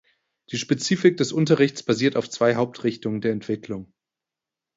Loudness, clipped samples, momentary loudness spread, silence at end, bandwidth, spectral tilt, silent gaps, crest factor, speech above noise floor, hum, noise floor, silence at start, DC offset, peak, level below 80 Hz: -23 LUFS; under 0.1%; 11 LU; 0.95 s; 8 kHz; -5.5 dB/octave; none; 20 dB; 66 dB; none; -88 dBFS; 0.5 s; under 0.1%; -4 dBFS; -64 dBFS